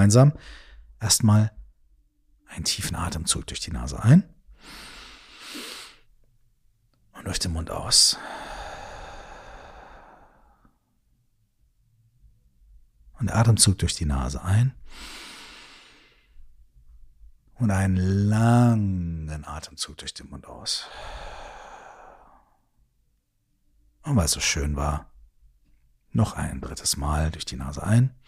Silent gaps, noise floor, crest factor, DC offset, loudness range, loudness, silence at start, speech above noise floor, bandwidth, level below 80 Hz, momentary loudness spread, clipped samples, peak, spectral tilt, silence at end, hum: none; -70 dBFS; 24 dB; under 0.1%; 12 LU; -23 LUFS; 0 s; 47 dB; 15.5 kHz; -40 dBFS; 24 LU; under 0.1%; -2 dBFS; -4.5 dB/octave; 0.15 s; none